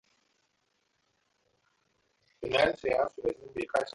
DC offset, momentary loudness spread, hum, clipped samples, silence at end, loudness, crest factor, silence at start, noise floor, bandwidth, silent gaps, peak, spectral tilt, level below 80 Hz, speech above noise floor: under 0.1%; 10 LU; none; under 0.1%; 0.05 s; -30 LUFS; 22 dB; 2.4 s; -76 dBFS; 11.5 kHz; none; -12 dBFS; -4.5 dB/octave; -62 dBFS; 46 dB